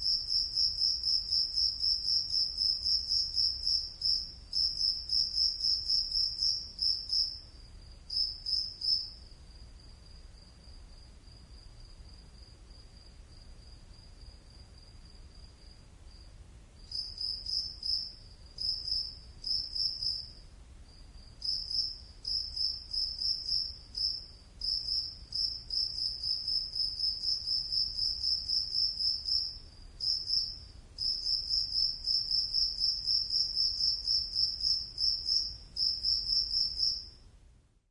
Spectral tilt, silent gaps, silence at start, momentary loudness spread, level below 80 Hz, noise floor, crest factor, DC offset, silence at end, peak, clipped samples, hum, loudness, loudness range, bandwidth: -1 dB/octave; none; 0 s; 8 LU; -52 dBFS; -61 dBFS; 18 dB; under 0.1%; 0.5 s; -16 dBFS; under 0.1%; none; -30 LUFS; 7 LU; 11.5 kHz